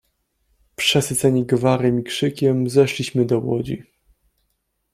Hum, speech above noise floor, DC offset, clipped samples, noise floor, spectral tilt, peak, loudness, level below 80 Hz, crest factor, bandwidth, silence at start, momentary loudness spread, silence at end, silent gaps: none; 53 dB; under 0.1%; under 0.1%; -72 dBFS; -5 dB/octave; -2 dBFS; -19 LUFS; -54 dBFS; 18 dB; 15.5 kHz; 0.8 s; 7 LU; 1.1 s; none